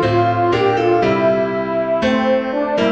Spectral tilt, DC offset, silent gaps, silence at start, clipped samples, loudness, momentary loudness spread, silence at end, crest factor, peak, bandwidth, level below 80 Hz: -7 dB/octave; 0.2%; none; 0 s; under 0.1%; -16 LUFS; 4 LU; 0 s; 12 dB; -4 dBFS; 8 kHz; -46 dBFS